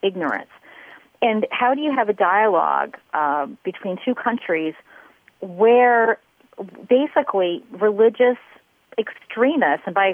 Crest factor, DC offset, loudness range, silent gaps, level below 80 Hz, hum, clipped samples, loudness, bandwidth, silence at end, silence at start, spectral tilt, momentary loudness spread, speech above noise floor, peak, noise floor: 14 dB; under 0.1%; 3 LU; none; -76 dBFS; none; under 0.1%; -20 LUFS; 3.6 kHz; 0 s; 0.05 s; -7.5 dB/octave; 13 LU; 30 dB; -6 dBFS; -49 dBFS